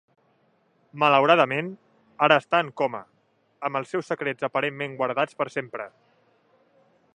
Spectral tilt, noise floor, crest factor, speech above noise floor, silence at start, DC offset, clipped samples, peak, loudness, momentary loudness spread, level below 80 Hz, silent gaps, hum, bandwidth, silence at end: -5.5 dB/octave; -66 dBFS; 24 dB; 43 dB; 0.95 s; under 0.1%; under 0.1%; -2 dBFS; -24 LUFS; 15 LU; -78 dBFS; none; none; 10 kHz; 1.25 s